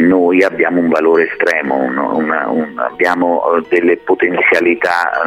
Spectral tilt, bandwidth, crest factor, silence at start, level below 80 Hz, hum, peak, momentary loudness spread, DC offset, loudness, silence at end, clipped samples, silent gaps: -6 dB/octave; 13 kHz; 12 dB; 0 s; -58 dBFS; none; 0 dBFS; 5 LU; under 0.1%; -13 LUFS; 0 s; under 0.1%; none